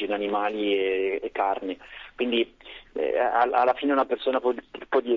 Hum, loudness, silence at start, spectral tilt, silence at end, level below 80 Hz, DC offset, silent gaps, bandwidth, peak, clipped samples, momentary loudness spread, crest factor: none; -26 LUFS; 0 s; -6 dB/octave; 0 s; -62 dBFS; under 0.1%; none; 5.8 kHz; -10 dBFS; under 0.1%; 13 LU; 16 dB